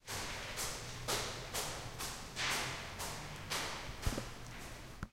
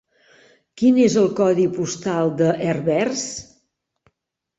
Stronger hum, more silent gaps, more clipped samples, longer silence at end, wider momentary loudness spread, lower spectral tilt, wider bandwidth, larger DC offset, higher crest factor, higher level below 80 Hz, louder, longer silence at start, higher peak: neither; neither; neither; second, 0 s vs 1.15 s; about the same, 11 LU vs 10 LU; second, -2.5 dB/octave vs -5.5 dB/octave; first, 16 kHz vs 8 kHz; neither; about the same, 20 dB vs 16 dB; first, -52 dBFS vs -60 dBFS; second, -41 LUFS vs -19 LUFS; second, 0.05 s vs 0.75 s; second, -22 dBFS vs -4 dBFS